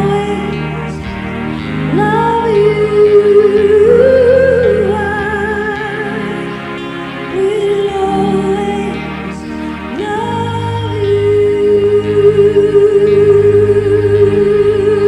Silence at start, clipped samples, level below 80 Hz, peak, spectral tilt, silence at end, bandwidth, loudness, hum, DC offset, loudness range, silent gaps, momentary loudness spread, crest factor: 0 s; under 0.1%; -36 dBFS; 0 dBFS; -7.5 dB/octave; 0 s; 10.5 kHz; -12 LUFS; none; under 0.1%; 7 LU; none; 13 LU; 10 dB